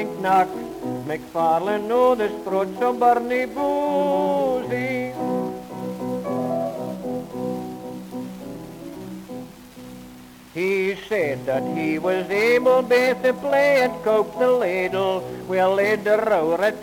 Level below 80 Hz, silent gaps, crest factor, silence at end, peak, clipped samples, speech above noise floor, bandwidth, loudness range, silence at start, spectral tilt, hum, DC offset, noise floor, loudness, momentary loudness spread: -58 dBFS; none; 16 dB; 0 s; -6 dBFS; under 0.1%; 23 dB; 17.5 kHz; 11 LU; 0 s; -5.5 dB/octave; none; under 0.1%; -43 dBFS; -22 LUFS; 17 LU